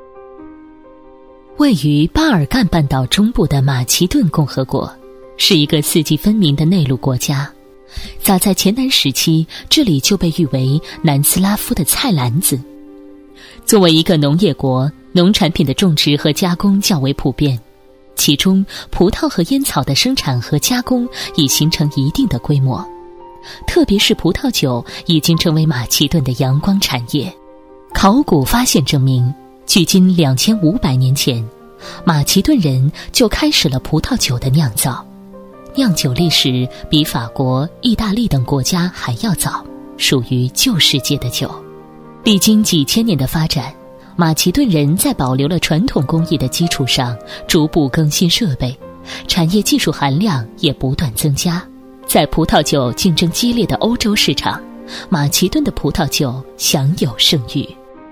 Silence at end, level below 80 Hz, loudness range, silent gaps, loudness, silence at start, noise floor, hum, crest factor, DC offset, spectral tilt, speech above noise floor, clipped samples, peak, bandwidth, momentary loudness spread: 0 s; -34 dBFS; 2 LU; none; -14 LUFS; 0 s; -43 dBFS; none; 14 dB; under 0.1%; -4.5 dB/octave; 30 dB; under 0.1%; 0 dBFS; 16 kHz; 8 LU